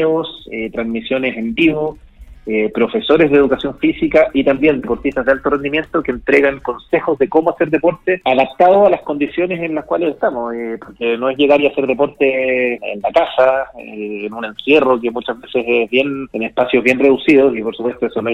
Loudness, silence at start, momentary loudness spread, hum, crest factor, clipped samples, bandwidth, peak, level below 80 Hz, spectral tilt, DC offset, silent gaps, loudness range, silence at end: -15 LUFS; 0 s; 11 LU; none; 14 dB; under 0.1%; 8.2 kHz; 0 dBFS; -44 dBFS; -7 dB/octave; under 0.1%; none; 2 LU; 0 s